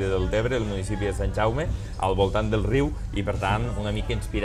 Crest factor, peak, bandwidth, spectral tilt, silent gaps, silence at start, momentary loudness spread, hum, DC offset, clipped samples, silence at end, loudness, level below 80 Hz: 16 dB; -10 dBFS; 12.5 kHz; -6.5 dB/octave; none; 0 s; 5 LU; none; under 0.1%; under 0.1%; 0 s; -26 LUFS; -32 dBFS